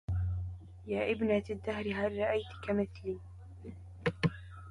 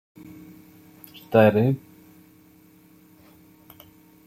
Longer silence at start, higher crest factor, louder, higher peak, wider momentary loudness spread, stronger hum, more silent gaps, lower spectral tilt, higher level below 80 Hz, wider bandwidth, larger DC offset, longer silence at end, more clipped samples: second, 0.1 s vs 1.3 s; second, 18 dB vs 24 dB; second, -35 LUFS vs -20 LUFS; second, -18 dBFS vs -4 dBFS; second, 17 LU vs 28 LU; neither; neither; about the same, -8 dB/octave vs -8.5 dB/octave; first, -48 dBFS vs -64 dBFS; second, 11 kHz vs 16.5 kHz; neither; second, 0 s vs 2.5 s; neither